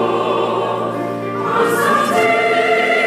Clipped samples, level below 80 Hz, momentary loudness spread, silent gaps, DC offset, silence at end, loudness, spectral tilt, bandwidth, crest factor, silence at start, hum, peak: under 0.1%; -62 dBFS; 7 LU; none; under 0.1%; 0 s; -16 LUFS; -4.5 dB/octave; 16 kHz; 12 dB; 0 s; none; -4 dBFS